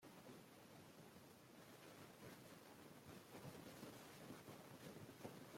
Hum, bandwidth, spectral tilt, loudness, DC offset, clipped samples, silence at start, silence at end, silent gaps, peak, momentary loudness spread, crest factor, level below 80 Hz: none; 16.5 kHz; -4.5 dB/octave; -61 LUFS; under 0.1%; under 0.1%; 0 s; 0 s; none; -40 dBFS; 5 LU; 20 dB; -86 dBFS